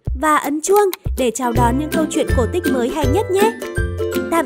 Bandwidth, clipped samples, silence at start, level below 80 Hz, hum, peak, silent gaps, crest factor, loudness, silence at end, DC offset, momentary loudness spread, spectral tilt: 16.5 kHz; under 0.1%; 0.05 s; -28 dBFS; none; 0 dBFS; none; 16 dB; -18 LUFS; 0 s; 0.2%; 6 LU; -5.5 dB/octave